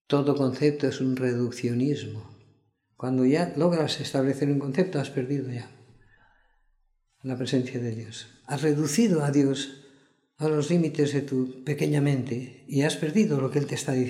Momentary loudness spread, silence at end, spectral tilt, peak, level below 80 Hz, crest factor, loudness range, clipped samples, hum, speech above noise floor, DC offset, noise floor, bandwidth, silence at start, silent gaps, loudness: 12 LU; 0 s; -6.5 dB/octave; -8 dBFS; -70 dBFS; 18 dB; 6 LU; under 0.1%; none; 43 dB; under 0.1%; -69 dBFS; 14.5 kHz; 0.1 s; none; -26 LUFS